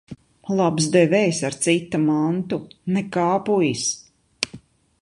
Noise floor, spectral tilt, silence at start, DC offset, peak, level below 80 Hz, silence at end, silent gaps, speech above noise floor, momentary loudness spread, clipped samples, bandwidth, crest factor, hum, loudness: -45 dBFS; -5 dB/octave; 0.1 s; under 0.1%; -2 dBFS; -60 dBFS; 0.45 s; none; 25 dB; 11 LU; under 0.1%; 11.5 kHz; 20 dB; none; -21 LUFS